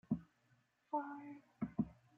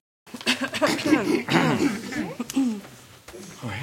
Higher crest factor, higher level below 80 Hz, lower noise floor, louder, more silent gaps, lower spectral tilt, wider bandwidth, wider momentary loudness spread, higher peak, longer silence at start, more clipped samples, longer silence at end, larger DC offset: about the same, 20 dB vs 20 dB; second, -70 dBFS vs -62 dBFS; first, -77 dBFS vs -46 dBFS; second, -45 LUFS vs -24 LUFS; neither; first, -9.5 dB/octave vs -4.5 dB/octave; second, 3.7 kHz vs 16.5 kHz; second, 9 LU vs 21 LU; second, -26 dBFS vs -6 dBFS; second, 0.1 s vs 0.25 s; neither; first, 0.25 s vs 0 s; neither